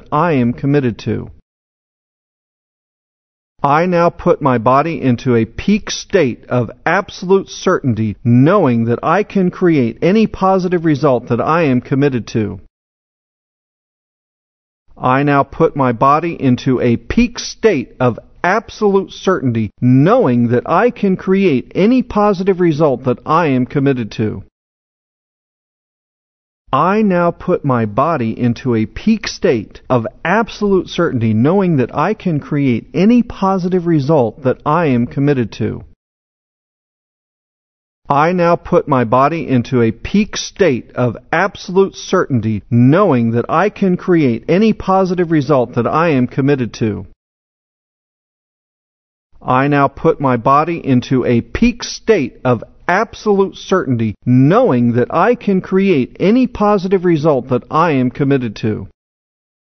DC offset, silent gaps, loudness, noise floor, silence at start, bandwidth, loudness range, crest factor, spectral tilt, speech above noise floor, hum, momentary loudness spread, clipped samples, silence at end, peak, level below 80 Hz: under 0.1%; 1.42-3.56 s, 12.70-14.86 s, 24.52-26.65 s, 35.96-38.02 s, 47.16-49.30 s; -14 LUFS; under -90 dBFS; 0.1 s; 6.4 kHz; 6 LU; 14 dB; -7 dB/octave; over 76 dB; none; 6 LU; under 0.1%; 0.75 s; 0 dBFS; -40 dBFS